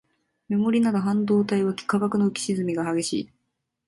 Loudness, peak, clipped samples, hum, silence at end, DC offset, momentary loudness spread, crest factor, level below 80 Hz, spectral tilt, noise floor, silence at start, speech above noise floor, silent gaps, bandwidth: -24 LUFS; -10 dBFS; under 0.1%; none; 0.6 s; under 0.1%; 7 LU; 14 dB; -64 dBFS; -6 dB/octave; -78 dBFS; 0.5 s; 55 dB; none; 11.5 kHz